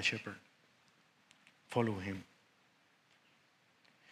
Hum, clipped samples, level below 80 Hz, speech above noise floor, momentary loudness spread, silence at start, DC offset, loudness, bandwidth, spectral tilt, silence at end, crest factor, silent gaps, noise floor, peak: none; under 0.1%; -82 dBFS; 34 dB; 19 LU; 0 s; under 0.1%; -39 LUFS; 15 kHz; -4.5 dB/octave; 0 s; 26 dB; none; -71 dBFS; -18 dBFS